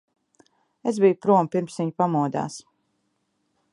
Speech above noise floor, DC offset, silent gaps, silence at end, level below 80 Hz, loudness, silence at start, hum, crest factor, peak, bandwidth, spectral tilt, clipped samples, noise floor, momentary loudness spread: 51 dB; under 0.1%; none; 1.1 s; -72 dBFS; -23 LUFS; 0.85 s; none; 20 dB; -6 dBFS; 11 kHz; -7 dB/octave; under 0.1%; -73 dBFS; 11 LU